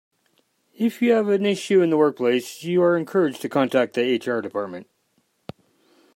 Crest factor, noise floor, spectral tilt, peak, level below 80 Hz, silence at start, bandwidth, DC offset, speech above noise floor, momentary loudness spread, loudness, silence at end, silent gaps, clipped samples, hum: 16 dB; -68 dBFS; -6 dB/octave; -6 dBFS; -74 dBFS; 0.8 s; 16 kHz; under 0.1%; 47 dB; 13 LU; -21 LUFS; 1.35 s; none; under 0.1%; none